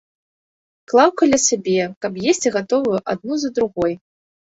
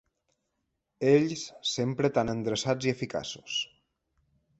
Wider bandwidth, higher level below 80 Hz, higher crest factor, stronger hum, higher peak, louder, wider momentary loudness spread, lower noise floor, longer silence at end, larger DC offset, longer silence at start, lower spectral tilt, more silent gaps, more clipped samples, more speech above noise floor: about the same, 8.2 kHz vs 8.2 kHz; first, -56 dBFS vs -64 dBFS; about the same, 18 dB vs 20 dB; neither; first, 0 dBFS vs -10 dBFS; first, -18 LUFS vs -29 LUFS; about the same, 8 LU vs 9 LU; first, under -90 dBFS vs -81 dBFS; second, 0.55 s vs 0.95 s; neither; about the same, 0.9 s vs 1 s; second, -3.5 dB/octave vs -5 dB/octave; first, 1.96-2.01 s vs none; neither; first, over 72 dB vs 53 dB